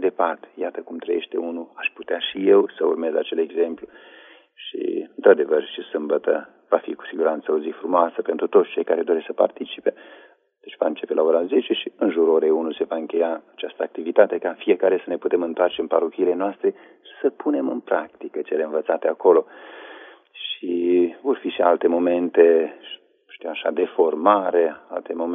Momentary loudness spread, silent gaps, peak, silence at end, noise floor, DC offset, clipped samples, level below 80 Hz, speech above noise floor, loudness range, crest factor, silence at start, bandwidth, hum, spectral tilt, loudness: 13 LU; none; -2 dBFS; 0 s; -44 dBFS; under 0.1%; under 0.1%; -78 dBFS; 23 dB; 3 LU; 20 dB; 0 s; 3.8 kHz; none; -2.5 dB/octave; -22 LUFS